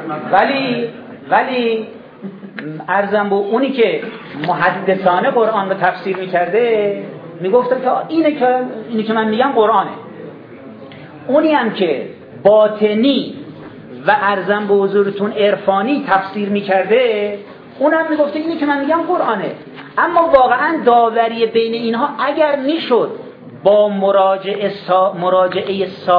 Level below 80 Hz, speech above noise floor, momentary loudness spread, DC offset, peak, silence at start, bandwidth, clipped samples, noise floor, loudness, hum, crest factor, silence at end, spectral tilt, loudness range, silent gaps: -58 dBFS; 20 dB; 18 LU; under 0.1%; 0 dBFS; 0 s; 5.2 kHz; under 0.1%; -35 dBFS; -15 LUFS; none; 16 dB; 0 s; -8.5 dB/octave; 3 LU; none